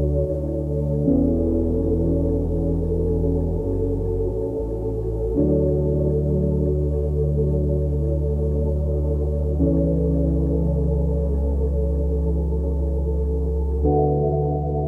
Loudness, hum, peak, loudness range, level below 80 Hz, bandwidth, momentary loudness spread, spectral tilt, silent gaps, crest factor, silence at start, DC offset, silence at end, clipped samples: -22 LUFS; none; -8 dBFS; 1 LU; -24 dBFS; 1.4 kHz; 4 LU; -12.5 dB/octave; none; 14 dB; 0 s; under 0.1%; 0 s; under 0.1%